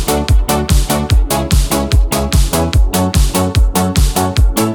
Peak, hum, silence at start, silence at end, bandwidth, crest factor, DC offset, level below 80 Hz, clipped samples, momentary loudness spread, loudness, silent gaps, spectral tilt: 0 dBFS; none; 0 s; 0 s; 19.5 kHz; 12 dB; 0.7%; -14 dBFS; under 0.1%; 1 LU; -13 LUFS; none; -5 dB/octave